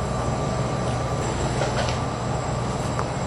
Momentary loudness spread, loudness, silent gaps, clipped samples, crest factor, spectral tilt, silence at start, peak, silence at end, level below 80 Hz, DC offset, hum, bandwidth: 2 LU; -25 LUFS; none; under 0.1%; 16 dB; -5.5 dB/octave; 0 s; -8 dBFS; 0 s; -36 dBFS; under 0.1%; none; 12 kHz